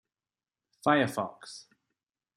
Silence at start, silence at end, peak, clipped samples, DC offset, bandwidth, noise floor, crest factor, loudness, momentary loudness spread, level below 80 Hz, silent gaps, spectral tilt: 0.85 s; 0.75 s; -10 dBFS; under 0.1%; under 0.1%; 14.5 kHz; under -90 dBFS; 24 dB; -29 LUFS; 20 LU; -78 dBFS; none; -5 dB/octave